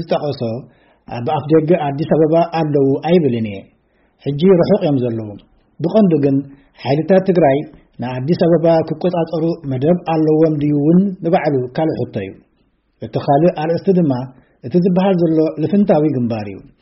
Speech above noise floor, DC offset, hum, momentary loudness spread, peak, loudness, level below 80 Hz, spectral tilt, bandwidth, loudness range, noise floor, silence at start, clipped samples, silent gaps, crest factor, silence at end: 45 dB; under 0.1%; none; 13 LU; -2 dBFS; -15 LUFS; -52 dBFS; -8 dB/octave; 5.8 kHz; 2 LU; -60 dBFS; 0 s; under 0.1%; none; 14 dB; 0.2 s